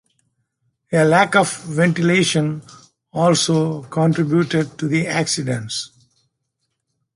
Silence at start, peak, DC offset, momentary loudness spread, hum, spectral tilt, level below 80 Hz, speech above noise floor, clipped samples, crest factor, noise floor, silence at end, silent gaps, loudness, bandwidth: 0.9 s; 0 dBFS; under 0.1%; 10 LU; none; -5 dB/octave; -60 dBFS; 57 dB; under 0.1%; 18 dB; -74 dBFS; 1.3 s; none; -18 LUFS; 11.5 kHz